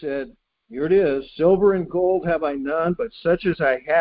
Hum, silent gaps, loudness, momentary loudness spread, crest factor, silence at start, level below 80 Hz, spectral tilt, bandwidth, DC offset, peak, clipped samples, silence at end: none; none; -21 LUFS; 11 LU; 14 dB; 0 s; -50 dBFS; -11.5 dB/octave; 5 kHz; under 0.1%; -6 dBFS; under 0.1%; 0 s